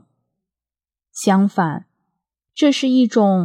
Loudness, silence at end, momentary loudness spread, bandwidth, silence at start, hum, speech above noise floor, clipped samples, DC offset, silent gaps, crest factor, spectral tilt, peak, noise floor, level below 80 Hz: -17 LUFS; 0 s; 18 LU; 13.5 kHz; 1.15 s; none; over 74 dB; under 0.1%; under 0.1%; none; 18 dB; -6 dB/octave; -2 dBFS; under -90 dBFS; -78 dBFS